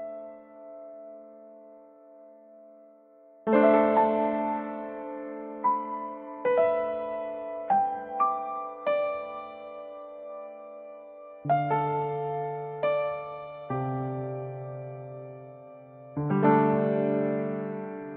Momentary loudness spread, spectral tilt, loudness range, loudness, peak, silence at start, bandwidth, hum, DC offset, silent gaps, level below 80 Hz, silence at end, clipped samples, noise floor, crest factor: 22 LU; -7 dB/octave; 8 LU; -28 LUFS; -10 dBFS; 0 s; 4.4 kHz; none; under 0.1%; none; -70 dBFS; 0 s; under 0.1%; -55 dBFS; 20 dB